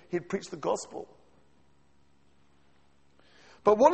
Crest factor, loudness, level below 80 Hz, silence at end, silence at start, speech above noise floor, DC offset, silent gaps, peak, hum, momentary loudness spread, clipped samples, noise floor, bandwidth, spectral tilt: 24 dB; -30 LUFS; -66 dBFS; 0 s; 0.1 s; 40 dB; under 0.1%; none; -8 dBFS; none; 19 LU; under 0.1%; -67 dBFS; 8.4 kHz; -5.5 dB/octave